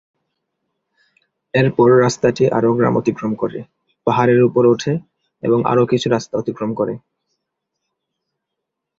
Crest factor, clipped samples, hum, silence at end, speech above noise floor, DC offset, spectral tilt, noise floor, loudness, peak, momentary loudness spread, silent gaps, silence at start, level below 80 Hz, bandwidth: 16 dB; under 0.1%; none; 2 s; 64 dB; under 0.1%; -6.5 dB/octave; -79 dBFS; -17 LUFS; -2 dBFS; 11 LU; none; 1.55 s; -54 dBFS; 7.8 kHz